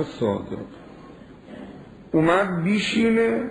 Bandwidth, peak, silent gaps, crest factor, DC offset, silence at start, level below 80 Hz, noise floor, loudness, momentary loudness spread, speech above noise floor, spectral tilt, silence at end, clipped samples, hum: 10.5 kHz; -6 dBFS; none; 18 dB; under 0.1%; 0 s; -54 dBFS; -44 dBFS; -22 LUFS; 23 LU; 22 dB; -6 dB/octave; 0 s; under 0.1%; none